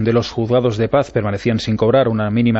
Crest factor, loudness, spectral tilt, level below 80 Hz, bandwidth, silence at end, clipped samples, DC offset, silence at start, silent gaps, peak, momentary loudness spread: 14 dB; -17 LUFS; -7.5 dB/octave; -44 dBFS; 8 kHz; 0 s; under 0.1%; under 0.1%; 0 s; none; -2 dBFS; 5 LU